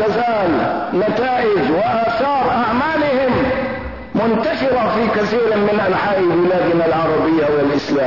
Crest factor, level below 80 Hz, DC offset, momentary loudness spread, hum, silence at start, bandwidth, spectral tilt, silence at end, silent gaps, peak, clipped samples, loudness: 10 dB; -42 dBFS; 0.5%; 3 LU; none; 0 s; 6 kHz; -7 dB/octave; 0 s; none; -6 dBFS; under 0.1%; -16 LUFS